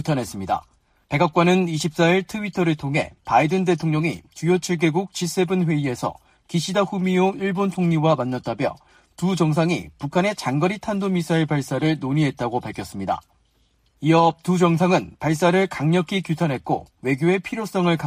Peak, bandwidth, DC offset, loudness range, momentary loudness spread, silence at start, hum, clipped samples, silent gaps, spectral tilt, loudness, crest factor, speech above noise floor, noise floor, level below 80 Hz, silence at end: -4 dBFS; 15.5 kHz; under 0.1%; 3 LU; 9 LU; 0 s; none; under 0.1%; none; -6 dB/octave; -22 LUFS; 16 dB; 42 dB; -63 dBFS; -56 dBFS; 0 s